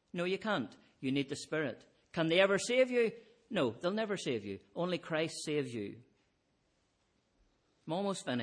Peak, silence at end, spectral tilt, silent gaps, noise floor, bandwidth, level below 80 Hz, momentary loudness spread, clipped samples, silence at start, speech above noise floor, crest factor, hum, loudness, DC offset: -14 dBFS; 0 s; -4.5 dB/octave; none; -77 dBFS; 10.5 kHz; -78 dBFS; 14 LU; under 0.1%; 0.15 s; 42 dB; 22 dB; none; -35 LUFS; under 0.1%